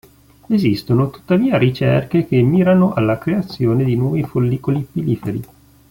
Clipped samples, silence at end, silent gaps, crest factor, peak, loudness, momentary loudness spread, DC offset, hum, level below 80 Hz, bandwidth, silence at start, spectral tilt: under 0.1%; 0.45 s; none; 14 dB; -2 dBFS; -17 LUFS; 7 LU; under 0.1%; none; -46 dBFS; 16.5 kHz; 0.5 s; -9 dB/octave